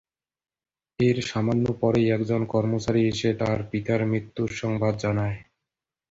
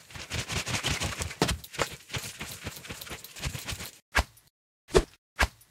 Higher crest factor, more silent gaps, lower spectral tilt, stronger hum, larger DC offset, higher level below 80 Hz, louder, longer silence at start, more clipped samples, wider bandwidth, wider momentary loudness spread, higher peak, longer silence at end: second, 16 dB vs 28 dB; second, none vs 4.02-4.12 s, 4.50-4.88 s, 5.18-5.36 s; first, -7 dB/octave vs -3.5 dB/octave; neither; neither; second, -52 dBFS vs -40 dBFS; first, -25 LUFS vs -32 LUFS; first, 1 s vs 0 s; neither; second, 7.8 kHz vs 18 kHz; second, 5 LU vs 12 LU; about the same, -8 dBFS vs -6 dBFS; first, 0.7 s vs 0.15 s